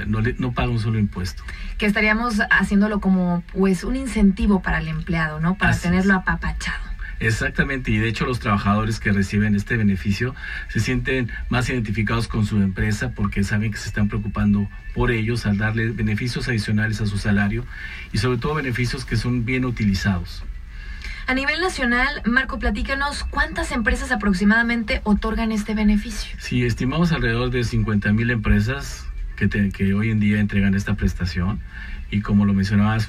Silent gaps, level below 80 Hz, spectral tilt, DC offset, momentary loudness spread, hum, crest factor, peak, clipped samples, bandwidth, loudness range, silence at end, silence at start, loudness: none; -32 dBFS; -6.5 dB/octave; under 0.1%; 8 LU; none; 16 dB; -4 dBFS; under 0.1%; 13.5 kHz; 3 LU; 0 s; 0 s; -21 LUFS